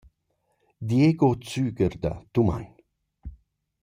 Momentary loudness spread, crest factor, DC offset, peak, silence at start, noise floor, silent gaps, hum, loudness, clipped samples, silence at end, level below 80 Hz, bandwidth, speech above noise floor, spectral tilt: 25 LU; 18 dB; under 0.1%; -8 dBFS; 0.8 s; -73 dBFS; none; none; -24 LUFS; under 0.1%; 0.5 s; -48 dBFS; 15.5 kHz; 50 dB; -8 dB/octave